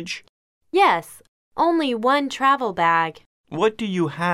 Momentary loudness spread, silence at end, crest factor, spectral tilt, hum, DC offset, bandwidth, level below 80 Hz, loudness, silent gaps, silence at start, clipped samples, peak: 12 LU; 0 s; 16 dB; -5 dB/octave; none; under 0.1%; 15 kHz; -64 dBFS; -20 LUFS; 0.29-0.61 s, 1.28-1.51 s, 3.26-3.44 s; 0 s; under 0.1%; -6 dBFS